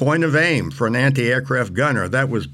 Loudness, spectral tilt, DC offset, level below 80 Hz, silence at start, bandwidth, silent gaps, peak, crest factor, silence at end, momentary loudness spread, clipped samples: -18 LUFS; -6 dB/octave; under 0.1%; -50 dBFS; 0 s; 12.5 kHz; none; -6 dBFS; 12 dB; 0 s; 4 LU; under 0.1%